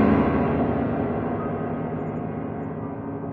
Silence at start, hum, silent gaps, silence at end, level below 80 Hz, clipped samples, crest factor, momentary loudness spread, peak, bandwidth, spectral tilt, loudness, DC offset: 0 s; none; none; 0 s; -44 dBFS; under 0.1%; 18 dB; 10 LU; -6 dBFS; 4.7 kHz; -11 dB/octave; -26 LUFS; under 0.1%